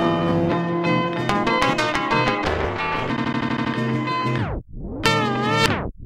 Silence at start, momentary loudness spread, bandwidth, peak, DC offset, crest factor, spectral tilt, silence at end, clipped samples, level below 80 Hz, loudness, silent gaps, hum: 0 s; 5 LU; 16 kHz; 0 dBFS; under 0.1%; 22 dB; -5.5 dB/octave; 0 s; under 0.1%; -40 dBFS; -21 LUFS; none; none